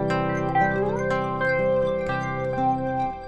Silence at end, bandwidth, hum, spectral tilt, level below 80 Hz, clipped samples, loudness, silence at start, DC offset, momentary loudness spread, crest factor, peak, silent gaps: 0 s; 8.4 kHz; none; -7.5 dB/octave; -46 dBFS; under 0.1%; -24 LUFS; 0 s; under 0.1%; 5 LU; 14 dB; -10 dBFS; none